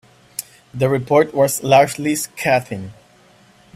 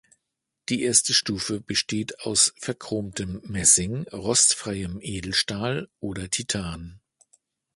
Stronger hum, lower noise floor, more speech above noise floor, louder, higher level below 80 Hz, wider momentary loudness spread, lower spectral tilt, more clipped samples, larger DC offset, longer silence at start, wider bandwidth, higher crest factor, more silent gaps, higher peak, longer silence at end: neither; second, -50 dBFS vs -82 dBFS; second, 34 dB vs 57 dB; first, -17 LUFS vs -23 LUFS; second, -56 dBFS vs -50 dBFS; first, 17 LU vs 14 LU; first, -4.5 dB/octave vs -2 dB/octave; neither; neither; second, 0.4 s vs 0.7 s; first, 16 kHz vs 12 kHz; about the same, 18 dB vs 22 dB; neither; first, 0 dBFS vs -4 dBFS; about the same, 0.85 s vs 0.8 s